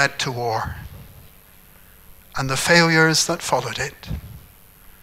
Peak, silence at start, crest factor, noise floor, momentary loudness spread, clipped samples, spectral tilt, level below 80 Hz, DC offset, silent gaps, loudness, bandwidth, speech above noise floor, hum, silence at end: 0 dBFS; 0 s; 22 dB; -48 dBFS; 19 LU; under 0.1%; -3.5 dB/octave; -44 dBFS; under 0.1%; none; -19 LUFS; 16 kHz; 28 dB; none; 0.65 s